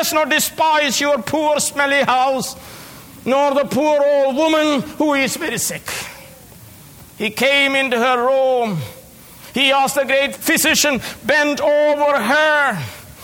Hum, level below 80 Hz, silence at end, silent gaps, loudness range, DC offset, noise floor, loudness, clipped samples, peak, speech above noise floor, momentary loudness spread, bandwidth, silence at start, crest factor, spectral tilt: none; -54 dBFS; 0 s; none; 3 LU; under 0.1%; -41 dBFS; -16 LUFS; under 0.1%; 0 dBFS; 24 dB; 13 LU; 19.5 kHz; 0 s; 16 dB; -2.5 dB/octave